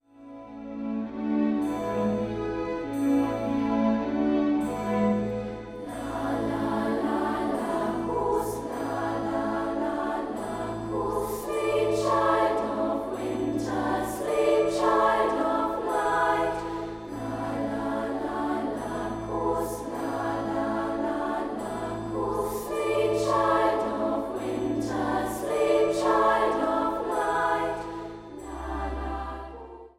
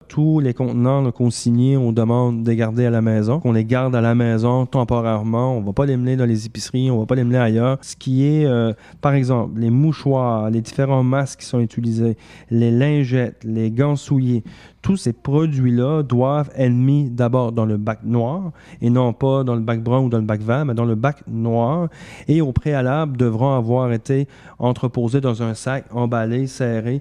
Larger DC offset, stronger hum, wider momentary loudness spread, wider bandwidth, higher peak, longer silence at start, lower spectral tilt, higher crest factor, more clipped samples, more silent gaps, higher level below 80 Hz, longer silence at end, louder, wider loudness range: second, under 0.1% vs 0.1%; neither; first, 10 LU vs 6 LU; first, 16 kHz vs 10.5 kHz; second, -10 dBFS vs -2 dBFS; about the same, 0.2 s vs 0.1 s; second, -6 dB/octave vs -8 dB/octave; about the same, 16 dB vs 16 dB; neither; neither; about the same, -48 dBFS vs -46 dBFS; about the same, 0.1 s vs 0 s; second, -27 LUFS vs -19 LUFS; first, 5 LU vs 2 LU